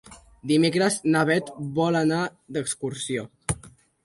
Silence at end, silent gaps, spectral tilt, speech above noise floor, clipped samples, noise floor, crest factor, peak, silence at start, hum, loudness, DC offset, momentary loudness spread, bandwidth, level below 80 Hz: 0.35 s; none; -5 dB/octave; 26 dB; under 0.1%; -50 dBFS; 16 dB; -8 dBFS; 0.05 s; none; -25 LUFS; under 0.1%; 10 LU; 11.5 kHz; -52 dBFS